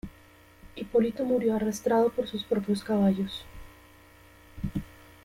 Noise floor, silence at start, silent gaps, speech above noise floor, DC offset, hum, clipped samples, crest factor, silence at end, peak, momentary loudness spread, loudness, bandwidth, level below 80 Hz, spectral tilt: -55 dBFS; 0.05 s; none; 29 dB; under 0.1%; none; under 0.1%; 16 dB; 0.4 s; -14 dBFS; 18 LU; -28 LUFS; 16 kHz; -52 dBFS; -6.5 dB/octave